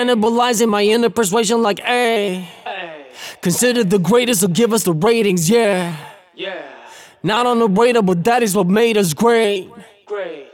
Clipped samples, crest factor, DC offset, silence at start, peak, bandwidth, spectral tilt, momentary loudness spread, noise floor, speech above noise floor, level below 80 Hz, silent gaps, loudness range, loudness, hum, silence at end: under 0.1%; 14 dB; under 0.1%; 0 s; -2 dBFS; 17.5 kHz; -4.5 dB/octave; 14 LU; -40 dBFS; 25 dB; -60 dBFS; none; 2 LU; -15 LUFS; none; 0.1 s